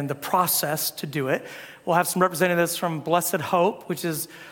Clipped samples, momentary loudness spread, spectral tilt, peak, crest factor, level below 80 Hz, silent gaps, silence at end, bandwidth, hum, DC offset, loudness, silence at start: under 0.1%; 8 LU; -4 dB/octave; -4 dBFS; 20 dB; -70 dBFS; none; 0 s; 18 kHz; none; under 0.1%; -24 LUFS; 0 s